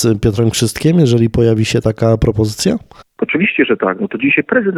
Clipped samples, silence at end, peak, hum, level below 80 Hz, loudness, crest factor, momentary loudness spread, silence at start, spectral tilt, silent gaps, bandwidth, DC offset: under 0.1%; 0 s; 0 dBFS; none; -32 dBFS; -14 LUFS; 12 dB; 5 LU; 0 s; -6 dB/octave; none; 15.5 kHz; under 0.1%